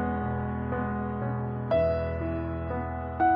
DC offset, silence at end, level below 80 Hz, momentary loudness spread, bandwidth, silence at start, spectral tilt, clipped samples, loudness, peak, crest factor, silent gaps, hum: under 0.1%; 0 s; -42 dBFS; 7 LU; 5 kHz; 0 s; -11.5 dB/octave; under 0.1%; -30 LUFS; -14 dBFS; 14 dB; none; none